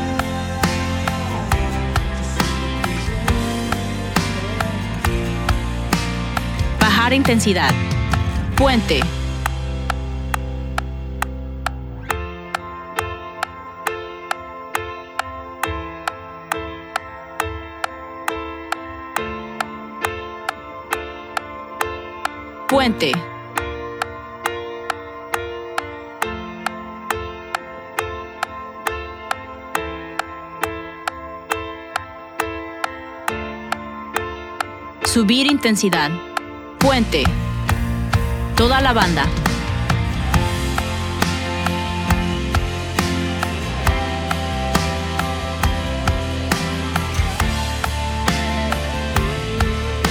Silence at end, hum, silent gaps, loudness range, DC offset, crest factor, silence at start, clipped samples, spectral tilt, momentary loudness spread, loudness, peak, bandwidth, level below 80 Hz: 0 s; none; none; 9 LU; under 0.1%; 22 dB; 0 s; under 0.1%; -5 dB/octave; 12 LU; -22 LUFS; 0 dBFS; over 20 kHz; -28 dBFS